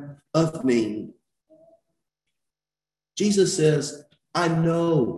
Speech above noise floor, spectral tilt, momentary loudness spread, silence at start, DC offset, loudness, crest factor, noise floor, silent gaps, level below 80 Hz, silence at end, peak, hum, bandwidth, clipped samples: over 68 dB; -5.5 dB/octave; 15 LU; 0 s; under 0.1%; -23 LUFS; 18 dB; under -90 dBFS; none; -60 dBFS; 0 s; -8 dBFS; none; 12.5 kHz; under 0.1%